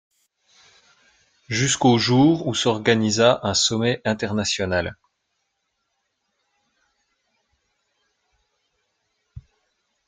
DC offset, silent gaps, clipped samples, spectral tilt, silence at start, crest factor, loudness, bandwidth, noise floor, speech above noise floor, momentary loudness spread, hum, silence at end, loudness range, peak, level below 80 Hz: under 0.1%; none; under 0.1%; -4 dB/octave; 1.5 s; 22 dB; -20 LUFS; 9.6 kHz; -75 dBFS; 55 dB; 7 LU; none; 0.65 s; 11 LU; -2 dBFS; -56 dBFS